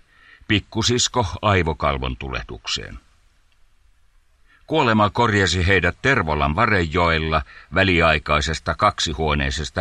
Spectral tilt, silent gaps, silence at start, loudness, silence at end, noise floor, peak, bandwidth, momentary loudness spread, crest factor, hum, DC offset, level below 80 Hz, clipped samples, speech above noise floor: -4.5 dB/octave; none; 0.5 s; -19 LUFS; 0 s; -56 dBFS; -2 dBFS; 11 kHz; 9 LU; 18 dB; none; under 0.1%; -34 dBFS; under 0.1%; 37 dB